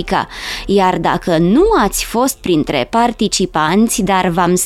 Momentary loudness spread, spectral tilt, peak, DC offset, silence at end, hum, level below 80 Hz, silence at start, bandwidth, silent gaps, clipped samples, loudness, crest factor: 5 LU; -4.5 dB/octave; 0 dBFS; under 0.1%; 0 s; none; -34 dBFS; 0 s; 16.5 kHz; none; under 0.1%; -14 LUFS; 12 dB